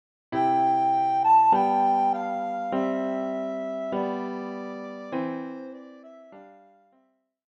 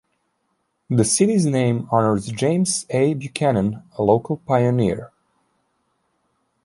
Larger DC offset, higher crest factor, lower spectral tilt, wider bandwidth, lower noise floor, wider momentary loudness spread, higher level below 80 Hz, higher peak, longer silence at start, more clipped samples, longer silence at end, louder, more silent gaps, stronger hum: neither; about the same, 16 dB vs 18 dB; first, -7 dB/octave vs -5.5 dB/octave; second, 7.4 kHz vs 11.5 kHz; about the same, -68 dBFS vs -71 dBFS; first, 16 LU vs 6 LU; second, -76 dBFS vs -52 dBFS; second, -10 dBFS vs -2 dBFS; second, 0.3 s vs 0.9 s; neither; second, 1.05 s vs 1.6 s; second, -25 LUFS vs -20 LUFS; neither; neither